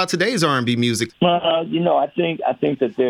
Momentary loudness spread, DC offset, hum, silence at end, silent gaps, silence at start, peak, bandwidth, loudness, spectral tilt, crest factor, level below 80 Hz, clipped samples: 4 LU; under 0.1%; none; 0 s; none; 0 s; -2 dBFS; 16 kHz; -19 LUFS; -5 dB/octave; 16 dB; -62 dBFS; under 0.1%